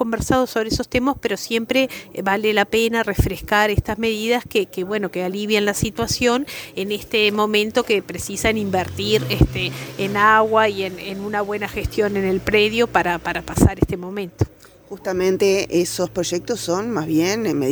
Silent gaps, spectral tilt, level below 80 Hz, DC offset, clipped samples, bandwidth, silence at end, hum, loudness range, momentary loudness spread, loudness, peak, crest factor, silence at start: none; -4.5 dB/octave; -36 dBFS; under 0.1%; under 0.1%; over 20 kHz; 0 s; none; 2 LU; 8 LU; -20 LUFS; 0 dBFS; 20 dB; 0 s